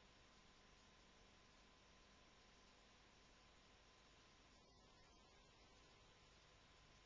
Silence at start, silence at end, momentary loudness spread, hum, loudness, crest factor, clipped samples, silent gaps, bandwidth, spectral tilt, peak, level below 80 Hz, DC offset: 0 s; 0 s; 1 LU; none; -70 LUFS; 14 dB; under 0.1%; none; 7.2 kHz; -2.5 dB/octave; -58 dBFS; -78 dBFS; under 0.1%